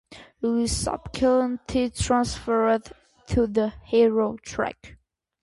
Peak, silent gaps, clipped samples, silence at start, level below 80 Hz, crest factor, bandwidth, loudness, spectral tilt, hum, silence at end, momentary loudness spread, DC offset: -8 dBFS; none; under 0.1%; 0.1 s; -42 dBFS; 16 dB; 11.5 kHz; -24 LUFS; -5 dB/octave; none; 0.5 s; 8 LU; under 0.1%